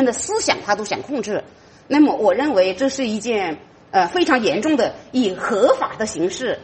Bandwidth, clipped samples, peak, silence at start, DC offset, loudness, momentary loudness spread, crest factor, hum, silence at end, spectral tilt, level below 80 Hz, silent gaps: 8.8 kHz; under 0.1%; -2 dBFS; 0 s; under 0.1%; -19 LUFS; 8 LU; 18 dB; none; 0 s; -3.5 dB/octave; -56 dBFS; none